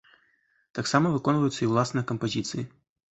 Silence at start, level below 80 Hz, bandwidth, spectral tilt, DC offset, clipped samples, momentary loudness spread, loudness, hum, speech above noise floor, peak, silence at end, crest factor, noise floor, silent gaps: 0.75 s; -62 dBFS; 8.6 kHz; -5.5 dB/octave; under 0.1%; under 0.1%; 12 LU; -26 LUFS; none; 42 dB; -6 dBFS; 0.5 s; 22 dB; -68 dBFS; none